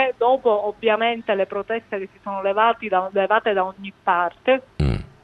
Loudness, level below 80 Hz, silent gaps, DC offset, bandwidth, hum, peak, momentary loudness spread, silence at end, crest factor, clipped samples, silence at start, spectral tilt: -21 LUFS; -38 dBFS; none; under 0.1%; 9.8 kHz; none; -4 dBFS; 8 LU; 0.2 s; 18 dB; under 0.1%; 0 s; -7.5 dB/octave